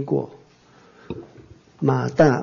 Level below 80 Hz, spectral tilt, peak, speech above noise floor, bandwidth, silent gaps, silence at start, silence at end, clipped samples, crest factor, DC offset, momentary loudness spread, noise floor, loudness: -54 dBFS; -8 dB/octave; -6 dBFS; 33 dB; 7.2 kHz; none; 0 s; 0 s; under 0.1%; 18 dB; under 0.1%; 20 LU; -53 dBFS; -21 LUFS